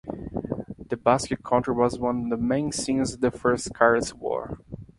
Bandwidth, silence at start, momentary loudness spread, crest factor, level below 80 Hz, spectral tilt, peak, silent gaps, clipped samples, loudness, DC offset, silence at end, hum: 11.5 kHz; 0.05 s; 13 LU; 22 dB; -50 dBFS; -5 dB/octave; -4 dBFS; none; under 0.1%; -25 LUFS; under 0.1%; 0.15 s; none